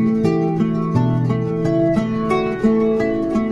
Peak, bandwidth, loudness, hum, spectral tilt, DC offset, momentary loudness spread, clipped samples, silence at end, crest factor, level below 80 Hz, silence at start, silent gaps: -4 dBFS; 9.2 kHz; -18 LUFS; none; -9 dB/octave; under 0.1%; 2 LU; under 0.1%; 0 s; 14 dB; -42 dBFS; 0 s; none